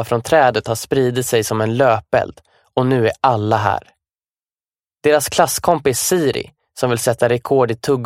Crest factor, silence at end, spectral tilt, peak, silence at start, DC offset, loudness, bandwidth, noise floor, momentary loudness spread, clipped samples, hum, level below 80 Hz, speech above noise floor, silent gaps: 16 dB; 0 s; -4.5 dB/octave; 0 dBFS; 0 s; under 0.1%; -17 LUFS; 16.5 kHz; under -90 dBFS; 6 LU; under 0.1%; none; -50 dBFS; over 74 dB; 4.30-4.36 s, 4.52-4.56 s